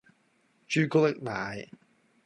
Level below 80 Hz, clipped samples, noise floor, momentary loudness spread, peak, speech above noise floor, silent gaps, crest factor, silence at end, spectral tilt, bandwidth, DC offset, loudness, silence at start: -68 dBFS; under 0.1%; -69 dBFS; 17 LU; -12 dBFS; 41 dB; none; 18 dB; 0.6 s; -6 dB/octave; 11 kHz; under 0.1%; -28 LUFS; 0.7 s